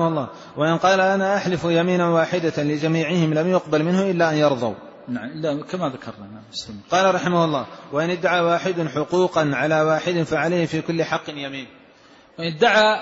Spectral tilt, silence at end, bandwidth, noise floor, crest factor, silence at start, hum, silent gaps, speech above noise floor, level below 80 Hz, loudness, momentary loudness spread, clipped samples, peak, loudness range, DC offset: -5.5 dB/octave; 0 s; 8 kHz; -50 dBFS; 16 dB; 0 s; none; none; 30 dB; -60 dBFS; -20 LUFS; 13 LU; under 0.1%; -4 dBFS; 4 LU; under 0.1%